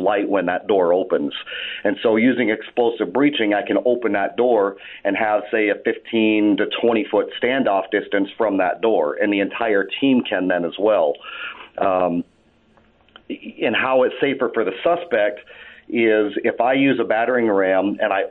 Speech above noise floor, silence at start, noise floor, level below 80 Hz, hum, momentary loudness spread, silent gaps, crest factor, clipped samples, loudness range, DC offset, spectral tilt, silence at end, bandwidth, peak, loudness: 37 dB; 0 s; -56 dBFS; -64 dBFS; none; 6 LU; none; 14 dB; under 0.1%; 3 LU; under 0.1%; -9 dB/octave; 0 s; 4.1 kHz; -6 dBFS; -19 LUFS